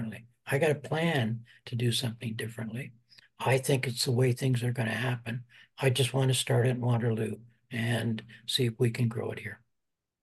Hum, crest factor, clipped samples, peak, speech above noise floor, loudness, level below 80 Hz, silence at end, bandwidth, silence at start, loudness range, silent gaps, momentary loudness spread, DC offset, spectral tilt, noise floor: none; 18 dB; under 0.1%; -12 dBFS; 55 dB; -30 LUFS; -70 dBFS; 0.65 s; 12.5 kHz; 0 s; 3 LU; none; 13 LU; under 0.1%; -5 dB/octave; -84 dBFS